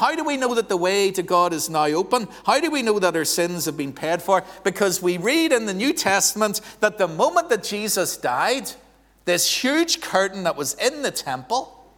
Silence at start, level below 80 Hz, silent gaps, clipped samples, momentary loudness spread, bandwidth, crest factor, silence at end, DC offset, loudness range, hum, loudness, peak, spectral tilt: 0 s; -60 dBFS; none; under 0.1%; 7 LU; 19.5 kHz; 18 dB; 0.3 s; under 0.1%; 2 LU; none; -21 LUFS; -2 dBFS; -2.5 dB/octave